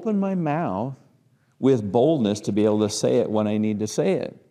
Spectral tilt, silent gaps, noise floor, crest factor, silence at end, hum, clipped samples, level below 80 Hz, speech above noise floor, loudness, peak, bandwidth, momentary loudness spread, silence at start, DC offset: -6.5 dB/octave; none; -61 dBFS; 16 dB; 0.2 s; none; under 0.1%; -68 dBFS; 40 dB; -22 LUFS; -8 dBFS; 13 kHz; 6 LU; 0 s; under 0.1%